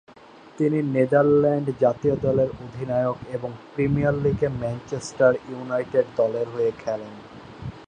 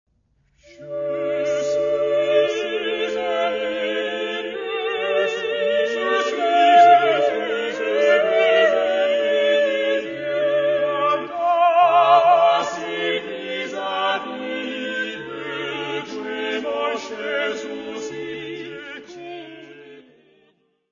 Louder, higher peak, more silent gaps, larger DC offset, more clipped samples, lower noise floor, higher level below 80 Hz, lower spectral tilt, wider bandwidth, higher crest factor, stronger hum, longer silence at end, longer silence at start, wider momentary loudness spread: second, -23 LUFS vs -20 LUFS; second, -6 dBFS vs -2 dBFS; neither; neither; neither; second, -48 dBFS vs -64 dBFS; first, -50 dBFS vs -64 dBFS; first, -8 dB/octave vs -3.5 dB/octave; first, 9.8 kHz vs 7.4 kHz; about the same, 18 dB vs 18 dB; neither; second, 0 s vs 0.9 s; second, 0.55 s vs 0.8 s; about the same, 13 LU vs 15 LU